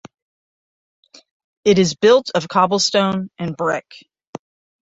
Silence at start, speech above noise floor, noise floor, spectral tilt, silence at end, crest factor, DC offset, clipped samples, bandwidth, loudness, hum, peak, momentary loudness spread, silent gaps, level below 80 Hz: 1.65 s; over 73 dB; under -90 dBFS; -4.5 dB/octave; 0.5 s; 18 dB; under 0.1%; under 0.1%; 8 kHz; -17 LUFS; none; -2 dBFS; 24 LU; 4.27-4.33 s; -58 dBFS